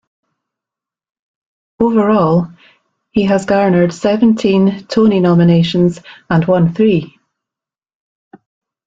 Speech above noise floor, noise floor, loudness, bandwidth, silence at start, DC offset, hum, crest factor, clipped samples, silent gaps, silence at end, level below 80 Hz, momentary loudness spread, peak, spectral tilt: 76 dB; -87 dBFS; -13 LUFS; 7.8 kHz; 1.8 s; under 0.1%; none; 12 dB; under 0.1%; none; 1.8 s; -50 dBFS; 6 LU; -2 dBFS; -8 dB/octave